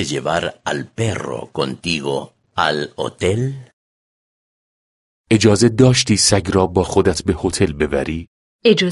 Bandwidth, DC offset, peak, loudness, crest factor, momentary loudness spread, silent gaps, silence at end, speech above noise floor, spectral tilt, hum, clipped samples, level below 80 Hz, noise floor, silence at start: 11.5 kHz; under 0.1%; 0 dBFS; -17 LUFS; 18 dB; 13 LU; 3.73-5.24 s, 8.27-8.59 s; 0 s; over 73 dB; -4.5 dB/octave; none; under 0.1%; -38 dBFS; under -90 dBFS; 0 s